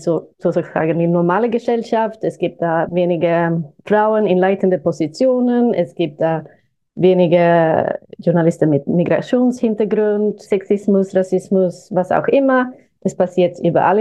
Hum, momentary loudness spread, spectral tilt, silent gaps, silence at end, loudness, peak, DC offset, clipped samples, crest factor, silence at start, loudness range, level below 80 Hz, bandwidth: none; 7 LU; -8 dB/octave; none; 0 s; -16 LUFS; 0 dBFS; under 0.1%; under 0.1%; 16 dB; 0 s; 2 LU; -62 dBFS; 9.6 kHz